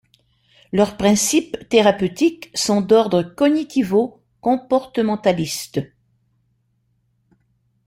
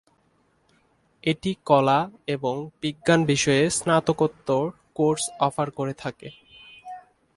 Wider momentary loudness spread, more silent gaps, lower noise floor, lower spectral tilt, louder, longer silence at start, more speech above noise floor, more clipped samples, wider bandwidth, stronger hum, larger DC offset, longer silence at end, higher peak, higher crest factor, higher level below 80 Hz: second, 9 LU vs 21 LU; neither; about the same, -66 dBFS vs -65 dBFS; about the same, -4.5 dB/octave vs -4.5 dB/octave; first, -19 LUFS vs -24 LUFS; second, 0.75 s vs 1.25 s; first, 48 dB vs 42 dB; neither; first, 16.5 kHz vs 11.5 kHz; neither; neither; first, 2 s vs 0.35 s; about the same, -2 dBFS vs -4 dBFS; about the same, 18 dB vs 20 dB; about the same, -54 dBFS vs -58 dBFS